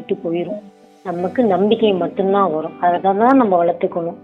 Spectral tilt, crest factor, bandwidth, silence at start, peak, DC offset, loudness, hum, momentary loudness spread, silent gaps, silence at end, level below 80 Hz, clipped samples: -8.5 dB/octave; 16 dB; 5.4 kHz; 0 s; 0 dBFS; under 0.1%; -17 LUFS; none; 12 LU; none; 0.05 s; -66 dBFS; under 0.1%